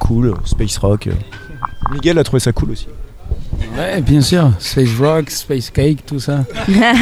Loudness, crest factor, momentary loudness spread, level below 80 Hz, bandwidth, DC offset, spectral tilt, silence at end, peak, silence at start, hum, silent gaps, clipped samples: -15 LUFS; 14 dB; 14 LU; -24 dBFS; 15.5 kHz; under 0.1%; -6 dB/octave; 0 s; 0 dBFS; 0 s; none; none; under 0.1%